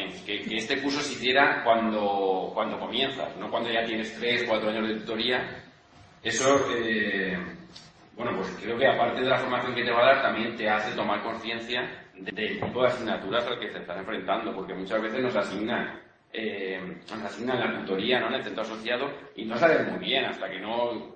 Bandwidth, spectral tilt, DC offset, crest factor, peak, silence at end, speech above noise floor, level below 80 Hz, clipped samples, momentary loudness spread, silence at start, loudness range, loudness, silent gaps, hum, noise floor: 8.8 kHz; -4 dB/octave; under 0.1%; 22 dB; -6 dBFS; 0 s; 27 dB; -64 dBFS; under 0.1%; 12 LU; 0 s; 5 LU; -27 LUFS; none; none; -54 dBFS